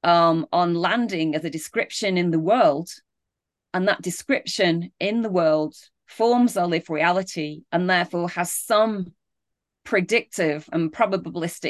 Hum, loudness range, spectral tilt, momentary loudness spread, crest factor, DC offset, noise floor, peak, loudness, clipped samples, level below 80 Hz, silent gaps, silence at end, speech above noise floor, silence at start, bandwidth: none; 2 LU; -5 dB/octave; 8 LU; 16 dB; under 0.1%; -84 dBFS; -6 dBFS; -22 LUFS; under 0.1%; -70 dBFS; none; 0 s; 62 dB; 0.05 s; 12.5 kHz